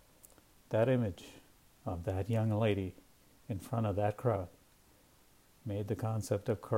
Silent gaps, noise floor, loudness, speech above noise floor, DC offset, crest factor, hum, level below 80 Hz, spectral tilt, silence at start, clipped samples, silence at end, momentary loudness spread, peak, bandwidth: none; -65 dBFS; -35 LUFS; 31 dB; under 0.1%; 18 dB; none; -62 dBFS; -7.5 dB/octave; 0.7 s; under 0.1%; 0 s; 14 LU; -18 dBFS; 16 kHz